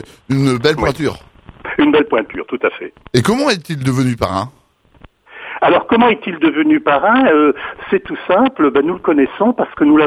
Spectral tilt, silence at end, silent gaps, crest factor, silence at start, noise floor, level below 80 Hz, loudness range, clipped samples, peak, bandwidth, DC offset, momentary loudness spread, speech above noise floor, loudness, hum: -6 dB/octave; 0 s; none; 14 dB; 0.3 s; -46 dBFS; -44 dBFS; 4 LU; under 0.1%; 0 dBFS; 14.5 kHz; under 0.1%; 11 LU; 32 dB; -14 LUFS; none